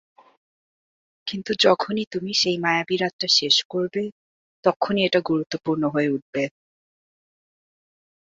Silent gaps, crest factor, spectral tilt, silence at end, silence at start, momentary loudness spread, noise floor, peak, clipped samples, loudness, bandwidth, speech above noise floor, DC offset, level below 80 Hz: 2.07-2.11 s, 3.13-3.19 s, 3.65-3.70 s, 4.12-4.63 s, 4.76-4.80 s, 6.22-6.33 s; 22 dB; -3.5 dB/octave; 1.8 s; 1.25 s; 11 LU; under -90 dBFS; -2 dBFS; under 0.1%; -22 LUFS; 7.8 kHz; over 68 dB; under 0.1%; -66 dBFS